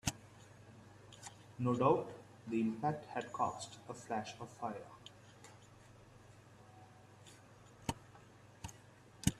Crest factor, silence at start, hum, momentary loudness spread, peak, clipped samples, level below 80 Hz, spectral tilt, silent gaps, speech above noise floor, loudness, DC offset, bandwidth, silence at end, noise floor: 26 dB; 0.05 s; none; 24 LU; -16 dBFS; under 0.1%; -64 dBFS; -5.5 dB/octave; none; 23 dB; -40 LUFS; under 0.1%; 14.5 kHz; 0 s; -61 dBFS